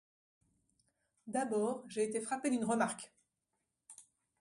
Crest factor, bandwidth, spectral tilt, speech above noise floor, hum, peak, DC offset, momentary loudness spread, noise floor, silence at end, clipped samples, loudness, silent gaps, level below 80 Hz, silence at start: 20 dB; 11.5 kHz; -4.5 dB/octave; 51 dB; none; -20 dBFS; under 0.1%; 22 LU; -87 dBFS; 0.4 s; under 0.1%; -37 LUFS; none; -82 dBFS; 1.25 s